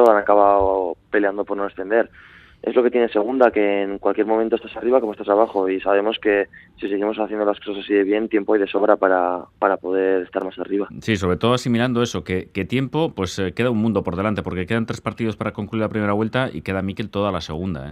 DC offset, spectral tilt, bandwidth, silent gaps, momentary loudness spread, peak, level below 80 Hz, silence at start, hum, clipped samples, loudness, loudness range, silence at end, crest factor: under 0.1%; -6.5 dB/octave; 13 kHz; none; 9 LU; 0 dBFS; -52 dBFS; 0 s; none; under 0.1%; -21 LUFS; 3 LU; 0 s; 20 dB